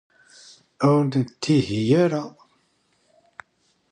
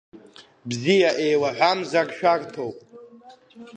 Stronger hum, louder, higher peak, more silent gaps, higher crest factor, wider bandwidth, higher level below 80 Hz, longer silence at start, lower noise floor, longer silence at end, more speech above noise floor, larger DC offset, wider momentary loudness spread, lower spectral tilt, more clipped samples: neither; about the same, -21 LUFS vs -22 LUFS; about the same, -6 dBFS vs -6 dBFS; neither; about the same, 18 dB vs 18 dB; about the same, 10.5 kHz vs 9.6 kHz; first, -60 dBFS vs -72 dBFS; first, 0.8 s vs 0.15 s; first, -66 dBFS vs -49 dBFS; first, 1.65 s vs 0 s; first, 46 dB vs 26 dB; neither; second, 8 LU vs 14 LU; first, -7 dB/octave vs -4.5 dB/octave; neither